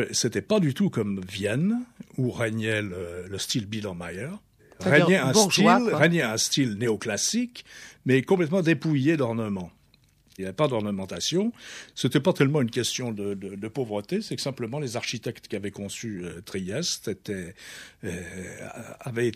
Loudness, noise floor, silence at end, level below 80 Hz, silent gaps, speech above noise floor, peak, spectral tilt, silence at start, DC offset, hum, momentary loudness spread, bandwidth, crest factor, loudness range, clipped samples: -26 LUFS; -61 dBFS; 0 s; -62 dBFS; none; 35 dB; -4 dBFS; -4.5 dB/octave; 0 s; under 0.1%; none; 17 LU; 15.5 kHz; 22 dB; 10 LU; under 0.1%